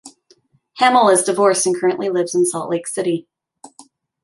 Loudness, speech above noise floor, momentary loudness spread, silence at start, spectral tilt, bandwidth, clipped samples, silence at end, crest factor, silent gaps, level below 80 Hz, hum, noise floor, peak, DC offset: -17 LUFS; 40 dB; 10 LU; 0.05 s; -3.5 dB/octave; 11.5 kHz; under 0.1%; 0.4 s; 18 dB; none; -68 dBFS; none; -56 dBFS; -2 dBFS; under 0.1%